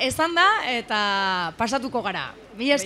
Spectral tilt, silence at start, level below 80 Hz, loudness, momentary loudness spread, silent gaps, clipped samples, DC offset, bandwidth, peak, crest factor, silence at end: -2.5 dB/octave; 0 s; -56 dBFS; -22 LUFS; 10 LU; none; under 0.1%; under 0.1%; 15.5 kHz; -4 dBFS; 18 dB; 0 s